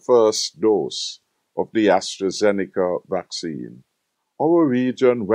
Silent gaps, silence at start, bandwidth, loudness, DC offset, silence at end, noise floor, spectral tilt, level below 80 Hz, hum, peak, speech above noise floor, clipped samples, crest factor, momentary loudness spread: none; 0.1 s; 15.5 kHz; -20 LUFS; under 0.1%; 0 s; -75 dBFS; -4.5 dB/octave; -70 dBFS; none; -4 dBFS; 55 dB; under 0.1%; 16 dB; 13 LU